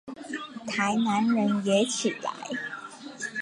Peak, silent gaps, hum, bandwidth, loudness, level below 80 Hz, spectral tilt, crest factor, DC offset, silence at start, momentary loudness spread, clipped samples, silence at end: -10 dBFS; none; none; 11.5 kHz; -28 LUFS; -72 dBFS; -4 dB/octave; 16 dB; under 0.1%; 0.05 s; 13 LU; under 0.1%; 0 s